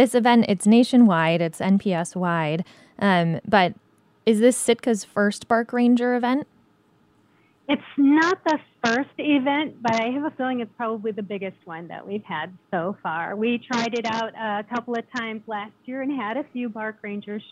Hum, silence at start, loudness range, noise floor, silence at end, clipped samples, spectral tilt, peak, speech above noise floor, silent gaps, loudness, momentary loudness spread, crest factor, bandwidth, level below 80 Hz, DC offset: none; 0 s; 8 LU; -61 dBFS; 0.1 s; under 0.1%; -5.5 dB/octave; -4 dBFS; 38 dB; none; -23 LUFS; 14 LU; 18 dB; 13.5 kHz; -68 dBFS; under 0.1%